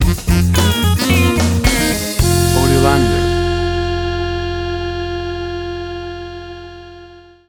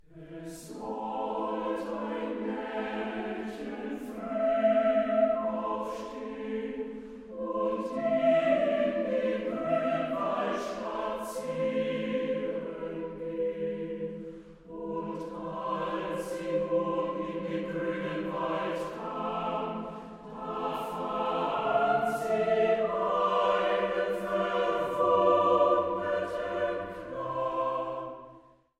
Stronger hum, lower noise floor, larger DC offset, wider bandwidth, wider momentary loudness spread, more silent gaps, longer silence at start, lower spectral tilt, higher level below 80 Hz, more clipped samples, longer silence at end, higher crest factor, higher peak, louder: neither; second, -40 dBFS vs -56 dBFS; neither; first, over 20 kHz vs 14.5 kHz; about the same, 15 LU vs 13 LU; neither; about the same, 0 s vs 0.1 s; about the same, -5 dB/octave vs -6 dB/octave; first, -24 dBFS vs -62 dBFS; neither; about the same, 0.3 s vs 0.4 s; about the same, 16 dB vs 18 dB; first, 0 dBFS vs -12 dBFS; first, -15 LUFS vs -30 LUFS